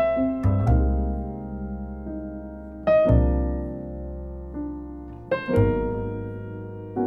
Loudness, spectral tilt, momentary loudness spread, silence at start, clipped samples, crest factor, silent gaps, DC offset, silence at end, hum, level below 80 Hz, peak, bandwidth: -25 LUFS; -10.5 dB/octave; 15 LU; 0 s; under 0.1%; 18 dB; none; under 0.1%; 0 s; none; -30 dBFS; -6 dBFS; 4.6 kHz